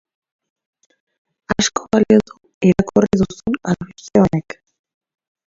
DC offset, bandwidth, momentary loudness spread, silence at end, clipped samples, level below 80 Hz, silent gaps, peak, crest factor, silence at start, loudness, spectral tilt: under 0.1%; 7.8 kHz; 10 LU; 1.1 s; under 0.1%; -44 dBFS; 2.54-2.61 s; 0 dBFS; 18 dB; 1.5 s; -17 LUFS; -5.5 dB/octave